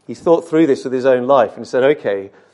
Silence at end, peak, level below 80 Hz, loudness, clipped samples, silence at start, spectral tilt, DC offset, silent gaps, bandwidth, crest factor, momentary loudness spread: 0.25 s; 0 dBFS; -62 dBFS; -15 LUFS; under 0.1%; 0.1 s; -6.5 dB/octave; under 0.1%; none; 11 kHz; 14 dB; 6 LU